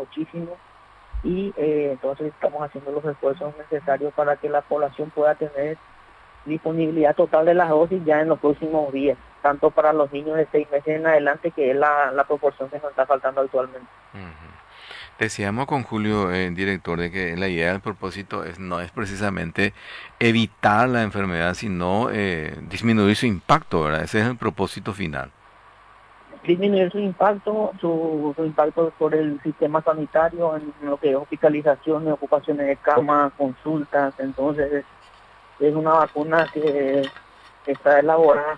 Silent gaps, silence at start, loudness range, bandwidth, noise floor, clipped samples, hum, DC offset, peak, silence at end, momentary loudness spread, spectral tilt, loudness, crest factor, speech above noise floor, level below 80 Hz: none; 0 s; 6 LU; 11 kHz; -50 dBFS; under 0.1%; none; under 0.1%; -4 dBFS; 0 s; 12 LU; -6.5 dB/octave; -22 LUFS; 18 dB; 29 dB; -50 dBFS